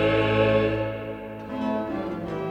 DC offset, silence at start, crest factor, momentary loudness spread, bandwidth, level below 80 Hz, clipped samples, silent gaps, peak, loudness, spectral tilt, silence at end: under 0.1%; 0 s; 16 dB; 14 LU; 8.8 kHz; -46 dBFS; under 0.1%; none; -10 dBFS; -25 LUFS; -8 dB/octave; 0 s